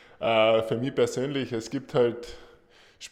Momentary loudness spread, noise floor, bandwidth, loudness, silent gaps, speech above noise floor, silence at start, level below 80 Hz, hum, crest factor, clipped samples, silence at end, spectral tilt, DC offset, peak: 16 LU; -56 dBFS; 14 kHz; -26 LUFS; none; 31 dB; 0.2 s; -60 dBFS; none; 18 dB; under 0.1%; 0.05 s; -5 dB/octave; under 0.1%; -8 dBFS